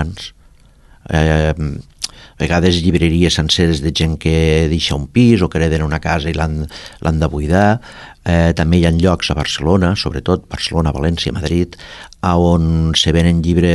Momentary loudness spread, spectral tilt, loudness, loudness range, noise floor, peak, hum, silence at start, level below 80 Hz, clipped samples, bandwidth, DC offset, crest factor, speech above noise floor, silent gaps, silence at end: 11 LU; -6 dB/octave; -15 LUFS; 3 LU; -46 dBFS; 0 dBFS; none; 0 s; -24 dBFS; under 0.1%; 12 kHz; under 0.1%; 14 dB; 31 dB; none; 0 s